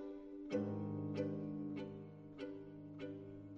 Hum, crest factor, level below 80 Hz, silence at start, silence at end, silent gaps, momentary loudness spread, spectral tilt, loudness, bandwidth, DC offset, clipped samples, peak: none; 18 dB; -74 dBFS; 0 s; 0 s; none; 11 LU; -8.5 dB/octave; -46 LUFS; 7.2 kHz; under 0.1%; under 0.1%; -28 dBFS